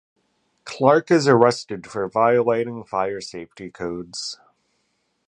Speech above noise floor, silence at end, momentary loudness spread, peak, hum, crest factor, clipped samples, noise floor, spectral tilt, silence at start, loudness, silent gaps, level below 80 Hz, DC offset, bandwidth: 50 dB; 0.95 s; 20 LU; -2 dBFS; none; 20 dB; under 0.1%; -70 dBFS; -5.5 dB/octave; 0.65 s; -20 LUFS; none; -62 dBFS; under 0.1%; 10 kHz